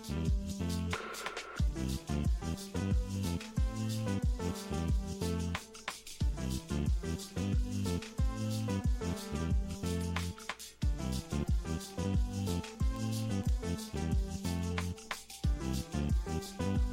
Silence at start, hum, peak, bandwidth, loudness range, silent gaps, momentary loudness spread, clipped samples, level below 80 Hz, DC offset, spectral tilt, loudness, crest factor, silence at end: 0 s; none; -20 dBFS; 16 kHz; 1 LU; none; 4 LU; under 0.1%; -38 dBFS; under 0.1%; -6 dB/octave; -36 LUFS; 14 dB; 0 s